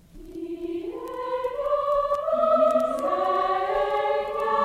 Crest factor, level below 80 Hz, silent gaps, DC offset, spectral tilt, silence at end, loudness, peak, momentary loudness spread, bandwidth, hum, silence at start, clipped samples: 14 dB; -52 dBFS; none; under 0.1%; -5 dB/octave; 0 s; -25 LUFS; -10 dBFS; 13 LU; 14.5 kHz; none; 0.15 s; under 0.1%